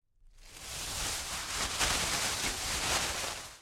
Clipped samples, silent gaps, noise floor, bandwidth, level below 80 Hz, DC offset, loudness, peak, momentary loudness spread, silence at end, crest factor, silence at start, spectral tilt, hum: under 0.1%; none; -56 dBFS; 16.5 kHz; -48 dBFS; under 0.1%; -32 LUFS; -14 dBFS; 10 LU; 0 s; 22 dB; 0.25 s; -1 dB/octave; none